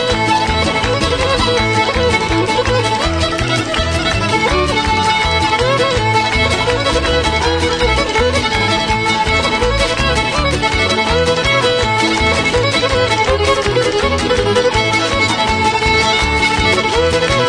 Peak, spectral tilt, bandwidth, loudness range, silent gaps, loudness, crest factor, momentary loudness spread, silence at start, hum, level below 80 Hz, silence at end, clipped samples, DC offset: 0 dBFS; -4 dB/octave; 10.5 kHz; 1 LU; none; -13 LUFS; 14 dB; 2 LU; 0 s; none; -26 dBFS; 0 s; under 0.1%; under 0.1%